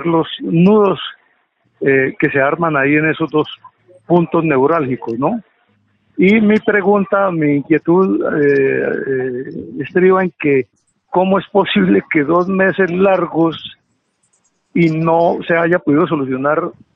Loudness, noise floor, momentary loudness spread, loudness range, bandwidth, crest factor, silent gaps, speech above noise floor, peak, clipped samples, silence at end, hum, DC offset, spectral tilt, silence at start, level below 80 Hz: -14 LUFS; -64 dBFS; 8 LU; 2 LU; 5.8 kHz; 14 dB; none; 50 dB; 0 dBFS; under 0.1%; 0.25 s; none; under 0.1%; -9 dB/octave; 0 s; -56 dBFS